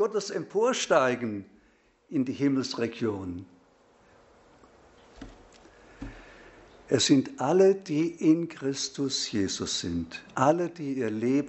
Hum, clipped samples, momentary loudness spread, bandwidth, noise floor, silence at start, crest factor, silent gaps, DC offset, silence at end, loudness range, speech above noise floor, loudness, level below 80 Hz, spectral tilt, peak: none; under 0.1%; 17 LU; 8.2 kHz; -64 dBFS; 0 s; 22 dB; none; under 0.1%; 0 s; 12 LU; 37 dB; -27 LUFS; -60 dBFS; -4.5 dB/octave; -8 dBFS